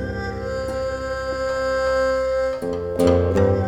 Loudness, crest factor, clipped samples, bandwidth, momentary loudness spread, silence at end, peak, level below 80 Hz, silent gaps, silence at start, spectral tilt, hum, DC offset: -22 LUFS; 16 dB; under 0.1%; 15 kHz; 9 LU; 0 s; -4 dBFS; -36 dBFS; none; 0 s; -6.5 dB/octave; none; under 0.1%